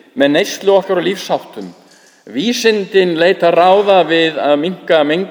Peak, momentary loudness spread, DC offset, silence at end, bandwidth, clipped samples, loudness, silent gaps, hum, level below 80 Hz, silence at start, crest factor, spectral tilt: 0 dBFS; 10 LU; under 0.1%; 0 s; over 20 kHz; under 0.1%; -13 LUFS; none; none; -66 dBFS; 0.15 s; 14 dB; -4.5 dB/octave